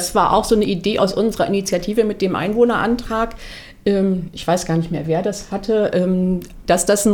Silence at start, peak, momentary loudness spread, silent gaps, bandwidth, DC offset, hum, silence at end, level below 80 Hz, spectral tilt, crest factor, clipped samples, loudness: 0 s; -2 dBFS; 7 LU; none; 19 kHz; under 0.1%; none; 0 s; -38 dBFS; -5 dB/octave; 16 dB; under 0.1%; -18 LUFS